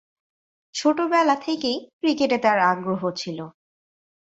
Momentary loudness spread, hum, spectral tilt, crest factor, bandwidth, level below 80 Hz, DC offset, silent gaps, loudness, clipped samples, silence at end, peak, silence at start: 13 LU; none; -4.5 dB/octave; 18 dB; 8 kHz; -68 dBFS; under 0.1%; 1.93-2.00 s; -22 LUFS; under 0.1%; 0.85 s; -6 dBFS; 0.75 s